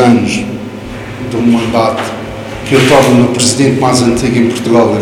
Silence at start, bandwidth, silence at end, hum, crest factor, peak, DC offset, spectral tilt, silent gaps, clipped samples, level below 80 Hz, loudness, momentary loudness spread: 0 s; 16 kHz; 0 s; none; 10 dB; 0 dBFS; under 0.1%; -5 dB/octave; none; 1%; -36 dBFS; -10 LUFS; 16 LU